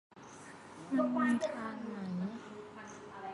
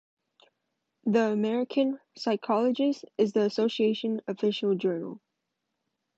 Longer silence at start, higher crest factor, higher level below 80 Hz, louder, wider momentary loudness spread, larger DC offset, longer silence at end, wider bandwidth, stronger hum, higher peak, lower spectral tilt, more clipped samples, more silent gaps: second, 0.1 s vs 1.05 s; about the same, 18 dB vs 16 dB; about the same, -76 dBFS vs -80 dBFS; second, -36 LUFS vs -28 LUFS; first, 20 LU vs 6 LU; neither; second, 0 s vs 1 s; first, 11.5 kHz vs 7.8 kHz; neither; second, -20 dBFS vs -12 dBFS; about the same, -6.5 dB/octave vs -6.5 dB/octave; neither; neither